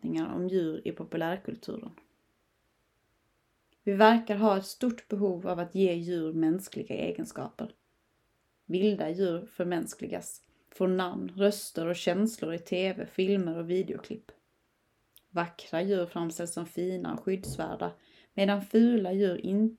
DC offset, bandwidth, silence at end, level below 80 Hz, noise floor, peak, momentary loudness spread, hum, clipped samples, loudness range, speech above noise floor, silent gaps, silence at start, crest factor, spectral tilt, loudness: under 0.1%; 15.5 kHz; 0.05 s; -68 dBFS; -74 dBFS; -6 dBFS; 13 LU; none; under 0.1%; 7 LU; 44 dB; none; 0 s; 24 dB; -6 dB/octave; -30 LUFS